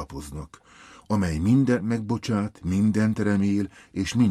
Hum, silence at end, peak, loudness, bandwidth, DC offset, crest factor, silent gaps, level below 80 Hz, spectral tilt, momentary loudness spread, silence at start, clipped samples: none; 0 s; -10 dBFS; -24 LUFS; 13 kHz; under 0.1%; 14 dB; none; -46 dBFS; -7 dB/octave; 15 LU; 0 s; under 0.1%